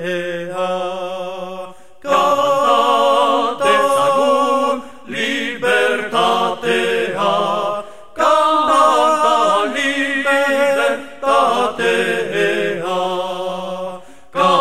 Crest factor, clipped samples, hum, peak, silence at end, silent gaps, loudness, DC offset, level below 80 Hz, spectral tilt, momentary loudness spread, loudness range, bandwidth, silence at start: 14 dB; under 0.1%; none; -2 dBFS; 0 s; none; -16 LUFS; 1%; -60 dBFS; -3.5 dB/octave; 12 LU; 3 LU; 14.5 kHz; 0 s